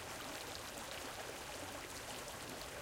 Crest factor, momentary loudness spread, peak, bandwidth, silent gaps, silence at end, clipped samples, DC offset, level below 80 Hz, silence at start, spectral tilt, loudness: 18 dB; 1 LU; -30 dBFS; 17 kHz; none; 0 s; under 0.1%; under 0.1%; -64 dBFS; 0 s; -2 dB/octave; -46 LUFS